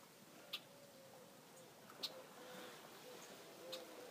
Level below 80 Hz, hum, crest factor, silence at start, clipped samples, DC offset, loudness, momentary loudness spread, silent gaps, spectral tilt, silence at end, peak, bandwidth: under -90 dBFS; none; 26 dB; 0 s; under 0.1%; under 0.1%; -54 LUFS; 12 LU; none; -2 dB/octave; 0 s; -30 dBFS; 15.5 kHz